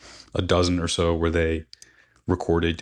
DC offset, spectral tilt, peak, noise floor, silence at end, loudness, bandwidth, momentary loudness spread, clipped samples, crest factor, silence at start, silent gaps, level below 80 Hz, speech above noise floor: under 0.1%; -5.5 dB/octave; -8 dBFS; -54 dBFS; 0 s; -24 LUFS; 10.5 kHz; 10 LU; under 0.1%; 16 dB; 0.05 s; none; -38 dBFS; 32 dB